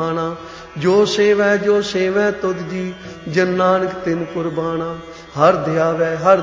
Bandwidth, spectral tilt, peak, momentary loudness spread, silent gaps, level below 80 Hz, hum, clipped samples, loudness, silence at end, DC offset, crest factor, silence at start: 7.6 kHz; -5.5 dB/octave; 0 dBFS; 13 LU; none; -50 dBFS; none; under 0.1%; -17 LUFS; 0 s; under 0.1%; 16 dB; 0 s